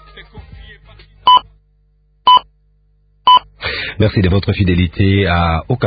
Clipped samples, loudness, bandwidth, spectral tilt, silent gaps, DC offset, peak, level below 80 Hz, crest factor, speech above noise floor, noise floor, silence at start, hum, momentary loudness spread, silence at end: under 0.1%; -13 LUFS; 5 kHz; -11 dB/octave; none; under 0.1%; 0 dBFS; -28 dBFS; 14 dB; 42 dB; -55 dBFS; 0.15 s; 50 Hz at -40 dBFS; 6 LU; 0 s